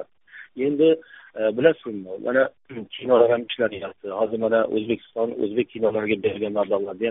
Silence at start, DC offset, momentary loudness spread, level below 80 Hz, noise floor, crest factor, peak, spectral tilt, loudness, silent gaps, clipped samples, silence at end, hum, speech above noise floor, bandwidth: 0 s; under 0.1%; 13 LU; -64 dBFS; -47 dBFS; 20 dB; -2 dBFS; -4 dB/octave; -23 LUFS; none; under 0.1%; 0 s; none; 24 dB; 3.9 kHz